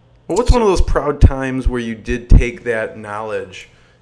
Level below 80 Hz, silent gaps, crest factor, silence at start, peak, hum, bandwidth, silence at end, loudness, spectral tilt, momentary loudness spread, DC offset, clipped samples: -18 dBFS; none; 16 dB; 0.3 s; 0 dBFS; none; 10.5 kHz; 0.4 s; -17 LUFS; -6.5 dB/octave; 11 LU; under 0.1%; 0.6%